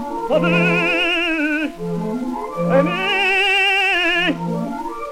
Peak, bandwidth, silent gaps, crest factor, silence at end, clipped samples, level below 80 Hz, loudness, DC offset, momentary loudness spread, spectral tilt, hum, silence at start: -4 dBFS; 15.5 kHz; none; 14 dB; 0 s; under 0.1%; -46 dBFS; -17 LUFS; under 0.1%; 11 LU; -5 dB/octave; none; 0 s